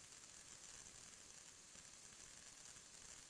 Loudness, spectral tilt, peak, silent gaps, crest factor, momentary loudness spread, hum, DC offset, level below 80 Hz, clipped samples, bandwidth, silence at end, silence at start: -58 LUFS; -0.5 dB/octave; -44 dBFS; none; 16 dB; 2 LU; none; under 0.1%; -78 dBFS; under 0.1%; 11 kHz; 0 s; 0 s